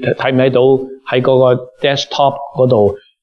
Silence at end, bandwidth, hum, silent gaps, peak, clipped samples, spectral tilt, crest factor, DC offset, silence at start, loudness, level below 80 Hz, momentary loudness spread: 0.25 s; 7 kHz; none; none; 0 dBFS; under 0.1%; -6.5 dB/octave; 12 dB; under 0.1%; 0 s; -13 LUFS; -54 dBFS; 5 LU